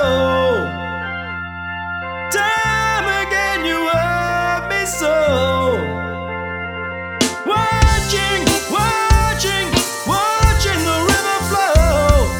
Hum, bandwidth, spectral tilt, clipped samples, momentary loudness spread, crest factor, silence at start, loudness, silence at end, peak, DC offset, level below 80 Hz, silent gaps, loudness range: none; 19.5 kHz; -4 dB/octave; under 0.1%; 10 LU; 16 dB; 0 s; -17 LUFS; 0 s; 0 dBFS; under 0.1%; -24 dBFS; none; 3 LU